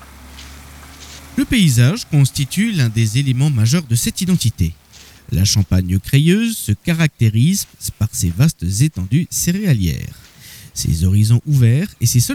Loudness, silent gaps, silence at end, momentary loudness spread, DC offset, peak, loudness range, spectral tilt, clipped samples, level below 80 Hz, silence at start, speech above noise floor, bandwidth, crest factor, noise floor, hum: -16 LUFS; none; 0 s; 12 LU; under 0.1%; -2 dBFS; 2 LU; -5 dB/octave; under 0.1%; -36 dBFS; 0 s; 26 dB; 17 kHz; 14 dB; -41 dBFS; none